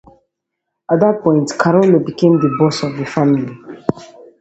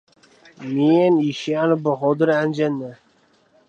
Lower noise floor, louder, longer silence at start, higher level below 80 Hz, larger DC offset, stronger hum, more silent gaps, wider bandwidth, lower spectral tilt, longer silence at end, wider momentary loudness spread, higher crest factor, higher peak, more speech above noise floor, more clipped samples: first, -77 dBFS vs -59 dBFS; first, -15 LUFS vs -19 LUFS; first, 0.9 s vs 0.6 s; first, -54 dBFS vs -72 dBFS; neither; neither; neither; about the same, 8.2 kHz vs 8 kHz; about the same, -7 dB/octave vs -7 dB/octave; second, 0.35 s vs 0.75 s; about the same, 11 LU vs 12 LU; about the same, 16 dB vs 16 dB; first, 0 dBFS vs -4 dBFS; first, 63 dB vs 40 dB; neither